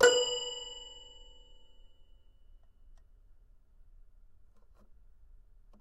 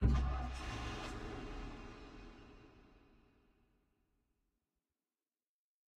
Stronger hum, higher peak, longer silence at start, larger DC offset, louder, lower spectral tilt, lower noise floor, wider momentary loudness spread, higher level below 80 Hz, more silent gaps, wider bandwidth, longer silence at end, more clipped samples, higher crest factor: neither; first, -10 dBFS vs -20 dBFS; about the same, 0 s vs 0 s; neither; first, -32 LUFS vs -44 LUFS; second, 0 dB/octave vs -6.5 dB/octave; second, -59 dBFS vs under -90 dBFS; first, 28 LU vs 21 LU; second, -58 dBFS vs -46 dBFS; neither; first, 14.5 kHz vs 9 kHz; first, 4.75 s vs 3 s; neither; about the same, 26 dB vs 24 dB